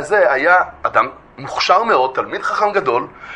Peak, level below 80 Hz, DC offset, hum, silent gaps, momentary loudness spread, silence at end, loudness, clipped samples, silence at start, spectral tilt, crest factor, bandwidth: 0 dBFS; -52 dBFS; under 0.1%; none; none; 9 LU; 0 s; -15 LUFS; under 0.1%; 0 s; -3.5 dB/octave; 16 dB; 10.5 kHz